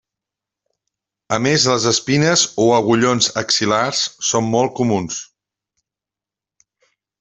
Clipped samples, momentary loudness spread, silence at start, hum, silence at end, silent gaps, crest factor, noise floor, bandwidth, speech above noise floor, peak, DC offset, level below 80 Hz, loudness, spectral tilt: under 0.1%; 6 LU; 1.3 s; none; 1.95 s; none; 18 dB; -88 dBFS; 8.4 kHz; 72 dB; 0 dBFS; under 0.1%; -56 dBFS; -16 LUFS; -3.5 dB/octave